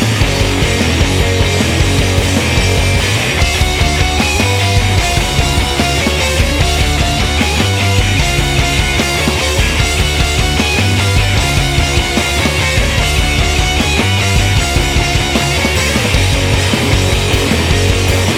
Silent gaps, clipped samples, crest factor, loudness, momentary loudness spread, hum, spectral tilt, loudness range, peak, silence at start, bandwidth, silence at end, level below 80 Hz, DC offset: none; under 0.1%; 12 dB; -12 LUFS; 1 LU; none; -4 dB/octave; 0 LU; 0 dBFS; 0 s; 16.5 kHz; 0 s; -18 dBFS; under 0.1%